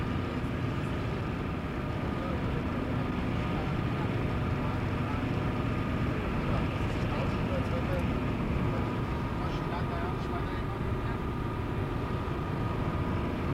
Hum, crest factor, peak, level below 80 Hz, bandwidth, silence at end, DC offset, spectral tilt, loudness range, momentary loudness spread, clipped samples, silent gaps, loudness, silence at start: none; 12 dB; -18 dBFS; -40 dBFS; 15.5 kHz; 0 s; under 0.1%; -8 dB/octave; 2 LU; 3 LU; under 0.1%; none; -32 LUFS; 0 s